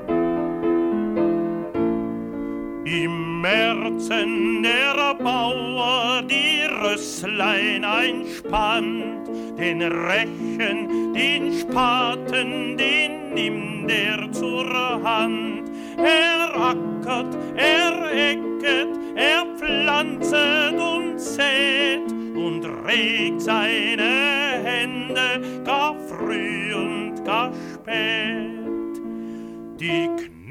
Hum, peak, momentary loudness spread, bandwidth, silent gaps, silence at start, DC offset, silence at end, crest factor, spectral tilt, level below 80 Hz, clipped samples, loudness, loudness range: none; -6 dBFS; 10 LU; 15.5 kHz; none; 0 s; under 0.1%; 0 s; 16 dB; -3.5 dB/octave; -52 dBFS; under 0.1%; -21 LUFS; 4 LU